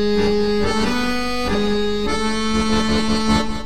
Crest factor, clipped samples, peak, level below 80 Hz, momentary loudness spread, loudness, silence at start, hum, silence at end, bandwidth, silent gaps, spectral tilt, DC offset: 14 dB; under 0.1%; -6 dBFS; -32 dBFS; 3 LU; -19 LUFS; 0 s; none; 0 s; 15 kHz; none; -4.5 dB/octave; 6%